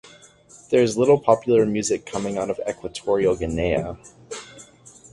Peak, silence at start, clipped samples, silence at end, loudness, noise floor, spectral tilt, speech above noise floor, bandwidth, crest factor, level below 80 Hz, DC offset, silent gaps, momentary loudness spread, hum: -2 dBFS; 0.05 s; under 0.1%; 0.5 s; -21 LUFS; -50 dBFS; -5.5 dB/octave; 29 dB; 11.5 kHz; 20 dB; -46 dBFS; under 0.1%; none; 19 LU; none